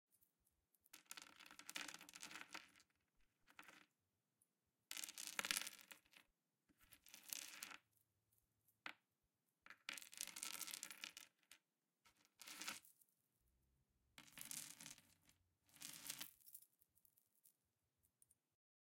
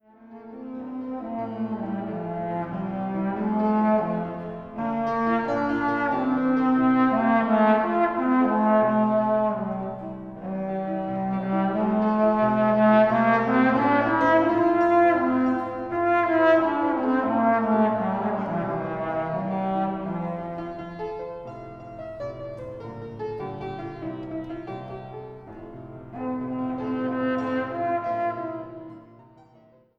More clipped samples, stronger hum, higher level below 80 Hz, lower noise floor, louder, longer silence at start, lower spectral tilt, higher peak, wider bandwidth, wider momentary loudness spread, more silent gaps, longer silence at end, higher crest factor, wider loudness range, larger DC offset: neither; neither; second, under -90 dBFS vs -56 dBFS; first, under -90 dBFS vs -56 dBFS; second, -53 LUFS vs -24 LUFS; first, 0.95 s vs 0.2 s; second, 1 dB/octave vs -9 dB/octave; second, -20 dBFS vs -8 dBFS; first, 16.5 kHz vs 6.2 kHz; about the same, 17 LU vs 17 LU; neither; first, 1.35 s vs 0.95 s; first, 40 dB vs 16 dB; second, 8 LU vs 14 LU; neither